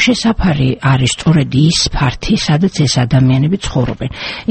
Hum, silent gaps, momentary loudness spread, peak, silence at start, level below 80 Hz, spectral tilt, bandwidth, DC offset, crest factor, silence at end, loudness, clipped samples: none; none; 6 LU; 0 dBFS; 0 s; -28 dBFS; -5 dB/octave; 8.8 kHz; under 0.1%; 12 dB; 0.05 s; -13 LUFS; under 0.1%